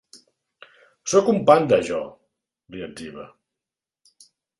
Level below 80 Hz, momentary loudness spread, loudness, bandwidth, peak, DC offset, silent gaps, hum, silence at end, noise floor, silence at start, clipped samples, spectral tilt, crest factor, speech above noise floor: -60 dBFS; 21 LU; -19 LUFS; 11.5 kHz; 0 dBFS; under 0.1%; none; none; 1.35 s; -89 dBFS; 1.05 s; under 0.1%; -5 dB/octave; 24 dB; 69 dB